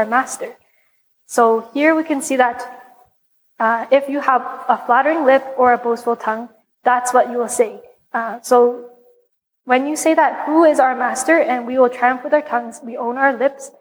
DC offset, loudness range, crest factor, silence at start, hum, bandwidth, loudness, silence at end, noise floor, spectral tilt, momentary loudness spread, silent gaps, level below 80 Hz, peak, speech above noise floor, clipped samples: under 0.1%; 3 LU; 16 dB; 0 s; none; over 20 kHz; -17 LUFS; 0.1 s; -63 dBFS; -3 dB/octave; 10 LU; none; -68 dBFS; -2 dBFS; 47 dB; under 0.1%